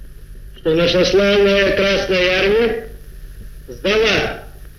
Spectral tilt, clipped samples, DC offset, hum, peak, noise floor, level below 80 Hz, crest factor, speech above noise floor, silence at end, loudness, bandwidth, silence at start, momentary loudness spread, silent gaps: -4.5 dB/octave; under 0.1%; under 0.1%; 50 Hz at -35 dBFS; -2 dBFS; -35 dBFS; -34 dBFS; 14 dB; 20 dB; 0.1 s; -15 LUFS; 15 kHz; 0 s; 13 LU; none